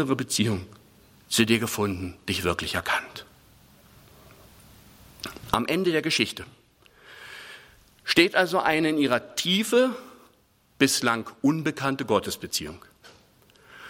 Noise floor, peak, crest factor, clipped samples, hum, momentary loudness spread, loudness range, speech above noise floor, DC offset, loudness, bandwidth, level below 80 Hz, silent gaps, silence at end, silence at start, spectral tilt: -62 dBFS; -2 dBFS; 24 dB; under 0.1%; none; 19 LU; 7 LU; 37 dB; under 0.1%; -24 LUFS; 16.5 kHz; -58 dBFS; none; 0 s; 0 s; -3.5 dB/octave